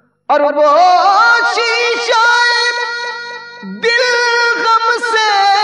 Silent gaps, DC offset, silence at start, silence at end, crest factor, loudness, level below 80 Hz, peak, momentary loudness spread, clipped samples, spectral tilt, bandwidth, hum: none; under 0.1%; 0.3 s; 0 s; 12 dB; -11 LUFS; -74 dBFS; 0 dBFS; 11 LU; under 0.1%; -1 dB/octave; 11.5 kHz; none